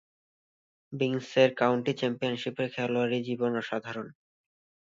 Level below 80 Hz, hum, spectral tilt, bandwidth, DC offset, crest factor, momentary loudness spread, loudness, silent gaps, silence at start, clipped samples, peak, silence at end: -76 dBFS; none; -6 dB/octave; 7.6 kHz; under 0.1%; 22 dB; 13 LU; -29 LUFS; none; 0.9 s; under 0.1%; -8 dBFS; 0.75 s